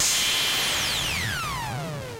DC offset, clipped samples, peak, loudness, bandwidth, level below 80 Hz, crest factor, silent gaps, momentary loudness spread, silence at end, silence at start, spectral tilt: under 0.1%; under 0.1%; -12 dBFS; -23 LUFS; 16 kHz; -46 dBFS; 14 dB; none; 10 LU; 0 s; 0 s; -1 dB/octave